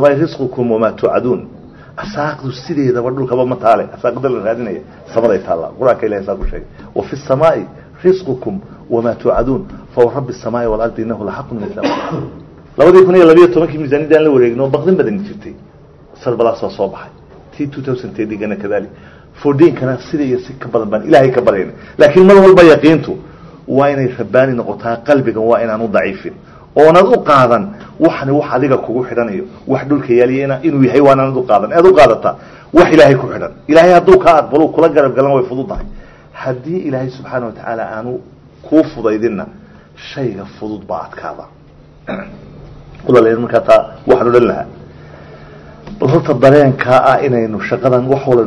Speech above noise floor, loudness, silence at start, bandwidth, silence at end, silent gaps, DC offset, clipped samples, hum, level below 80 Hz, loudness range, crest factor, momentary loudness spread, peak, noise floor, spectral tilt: 29 dB; -12 LUFS; 0 s; 9.6 kHz; 0 s; none; under 0.1%; 2%; none; -38 dBFS; 10 LU; 12 dB; 17 LU; 0 dBFS; -40 dBFS; -7.5 dB/octave